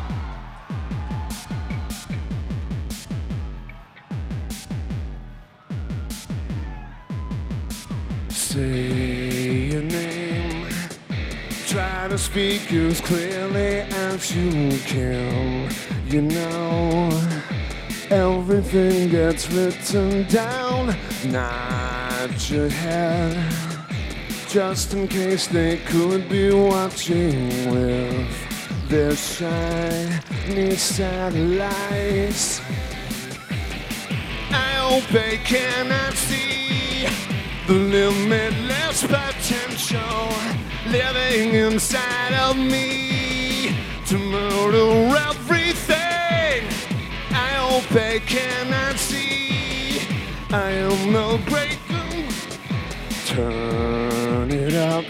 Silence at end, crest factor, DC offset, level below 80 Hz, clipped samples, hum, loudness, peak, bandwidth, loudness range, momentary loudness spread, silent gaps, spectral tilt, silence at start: 0 s; 18 dB; under 0.1%; -34 dBFS; under 0.1%; none; -22 LUFS; -4 dBFS; 16.5 kHz; 10 LU; 11 LU; none; -4.5 dB/octave; 0 s